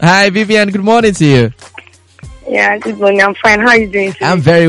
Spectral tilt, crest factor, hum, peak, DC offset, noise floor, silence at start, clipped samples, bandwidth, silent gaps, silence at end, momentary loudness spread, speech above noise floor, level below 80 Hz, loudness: -5.5 dB/octave; 10 dB; none; 0 dBFS; under 0.1%; -37 dBFS; 0 s; 0.4%; 11.5 kHz; none; 0 s; 7 LU; 28 dB; -40 dBFS; -10 LUFS